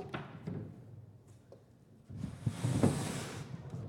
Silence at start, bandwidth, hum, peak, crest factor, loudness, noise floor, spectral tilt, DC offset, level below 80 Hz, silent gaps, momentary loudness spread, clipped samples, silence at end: 0 s; 17 kHz; none; -14 dBFS; 24 dB; -38 LUFS; -61 dBFS; -6 dB/octave; under 0.1%; -60 dBFS; none; 25 LU; under 0.1%; 0 s